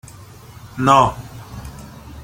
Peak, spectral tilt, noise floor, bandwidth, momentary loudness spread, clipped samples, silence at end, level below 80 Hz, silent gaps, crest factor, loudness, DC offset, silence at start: 0 dBFS; -5.5 dB/octave; -40 dBFS; 17 kHz; 24 LU; under 0.1%; 0 s; -42 dBFS; none; 20 dB; -15 LUFS; under 0.1%; 0.65 s